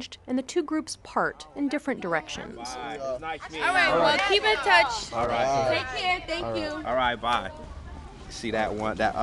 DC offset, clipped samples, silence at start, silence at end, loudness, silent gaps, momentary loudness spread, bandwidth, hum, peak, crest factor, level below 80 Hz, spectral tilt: under 0.1%; under 0.1%; 0 s; 0 s; -26 LUFS; none; 15 LU; 12 kHz; none; -6 dBFS; 22 dB; -48 dBFS; -3.5 dB/octave